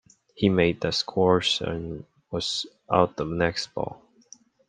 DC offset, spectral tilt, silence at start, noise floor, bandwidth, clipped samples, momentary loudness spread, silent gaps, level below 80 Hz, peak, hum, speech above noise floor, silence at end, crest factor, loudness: under 0.1%; -5 dB/octave; 0.35 s; -54 dBFS; 9.8 kHz; under 0.1%; 13 LU; none; -54 dBFS; -2 dBFS; none; 29 dB; 0.75 s; 24 dB; -25 LUFS